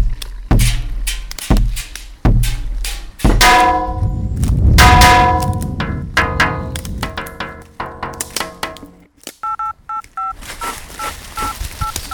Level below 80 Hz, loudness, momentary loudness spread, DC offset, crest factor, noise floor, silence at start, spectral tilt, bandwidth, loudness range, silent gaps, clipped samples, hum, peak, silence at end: -20 dBFS; -16 LUFS; 18 LU; under 0.1%; 16 dB; -40 dBFS; 0 s; -4 dB/octave; over 20 kHz; 13 LU; none; 0.1%; none; 0 dBFS; 0 s